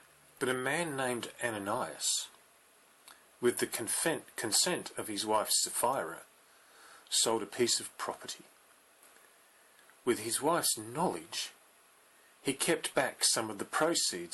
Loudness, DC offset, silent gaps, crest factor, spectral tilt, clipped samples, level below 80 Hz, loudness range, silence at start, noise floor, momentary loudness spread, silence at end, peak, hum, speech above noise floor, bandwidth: -32 LUFS; under 0.1%; none; 18 dB; -2 dB/octave; under 0.1%; -76 dBFS; 4 LU; 0.4 s; -63 dBFS; 11 LU; 0 s; -16 dBFS; none; 30 dB; 12.5 kHz